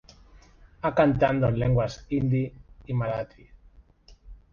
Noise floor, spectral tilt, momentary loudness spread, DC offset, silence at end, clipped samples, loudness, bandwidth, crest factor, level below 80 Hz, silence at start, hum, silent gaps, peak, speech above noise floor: -55 dBFS; -8.5 dB/octave; 11 LU; under 0.1%; 0.15 s; under 0.1%; -26 LUFS; 7 kHz; 20 dB; -46 dBFS; 0.85 s; none; none; -6 dBFS; 31 dB